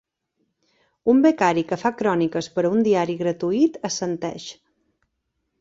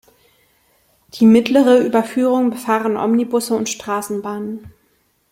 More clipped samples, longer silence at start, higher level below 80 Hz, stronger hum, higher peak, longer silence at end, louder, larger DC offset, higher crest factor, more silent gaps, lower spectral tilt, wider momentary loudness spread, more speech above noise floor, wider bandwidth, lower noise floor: neither; about the same, 1.05 s vs 1.15 s; about the same, -64 dBFS vs -60 dBFS; neither; about the same, -4 dBFS vs -2 dBFS; first, 1.1 s vs 0.6 s; second, -21 LUFS vs -16 LUFS; neither; about the same, 18 dB vs 16 dB; neither; about the same, -5.5 dB/octave vs -5 dB/octave; second, 10 LU vs 14 LU; first, 55 dB vs 46 dB; second, 7.8 kHz vs 16 kHz; first, -76 dBFS vs -61 dBFS